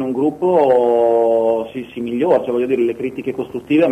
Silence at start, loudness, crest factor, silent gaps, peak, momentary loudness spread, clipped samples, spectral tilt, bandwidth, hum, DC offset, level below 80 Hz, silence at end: 0 s; -17 LUFS; 12 dB; none; -4 dBFS; 11 LU; under 0.1%; -7.5 dB/octave; 12.5 kHz; none; under 0.1%; -56 dBFS; 0 s